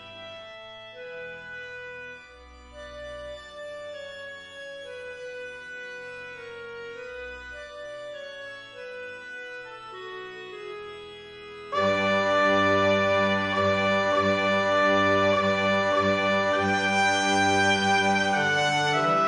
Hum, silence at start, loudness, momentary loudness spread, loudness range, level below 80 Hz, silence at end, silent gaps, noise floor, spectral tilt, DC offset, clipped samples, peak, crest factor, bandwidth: none; 0 s; -22 LUFS; 19 LU; 17 LU; -60 dBFS; 0 s; none; -48 dBFS; -4 dB/octave; under 0.1%; under 0.1%; -10 dBFS; 16 dB; 11 kHz